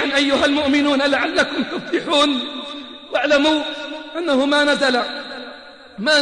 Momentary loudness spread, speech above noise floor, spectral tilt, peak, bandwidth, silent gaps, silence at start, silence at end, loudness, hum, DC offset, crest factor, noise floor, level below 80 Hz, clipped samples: 15 LU; 22 dB; -3 dB/octave; -4 dBFS; 10 kHz; none; 0 s; 0 s; -18 LUFS; none; 0.1%; 14 dB; -39 dBFS; -54 dBFS; under 0.1%